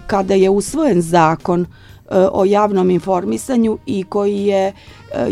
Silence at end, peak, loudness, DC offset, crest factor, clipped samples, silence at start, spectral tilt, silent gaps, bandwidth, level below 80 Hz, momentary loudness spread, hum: 0 s; 0 dBFS; -16 LUFS; under 0.1%; 16 dB; under 0.1%; 0 s; -6.5 dB/octave; none; 15 kHz; -44 dBFS; 7 LU; none